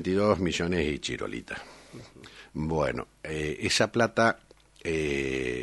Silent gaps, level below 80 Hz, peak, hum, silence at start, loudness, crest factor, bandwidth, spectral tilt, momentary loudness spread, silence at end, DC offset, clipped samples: none; -48 dBFS; -8 dBFS; none; 0 s; -28 LUFS; 22 dB; 11.5 kHz; -4.5 dB/octave; 21 LU; 0 s; under 0.1%; under 0.1%